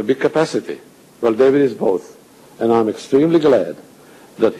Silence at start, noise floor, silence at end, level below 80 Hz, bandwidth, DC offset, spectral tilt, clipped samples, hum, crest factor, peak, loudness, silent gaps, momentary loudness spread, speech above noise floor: 0 s; -44 dBFS; 0 s; -58 dBFS; 13.5 kHz; under 0.1%; -6.5 dB/octave; under 0.1%; none; 14 dB; -2 dBFS; -16 LUFS; none; 13 LU; 28 dB